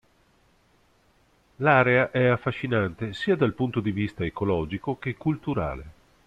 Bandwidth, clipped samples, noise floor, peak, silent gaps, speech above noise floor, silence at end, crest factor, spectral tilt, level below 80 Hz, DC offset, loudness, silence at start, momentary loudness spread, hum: 8.8 kHz; under 0.1%; -63 dBFS; -6 dBFS; none; 38 dB; 0.35 s; 20 dB; -8 dB/octave; -50 dBFS; under 0.1%; -25 LUFS; 1.6 s; 10 LU; none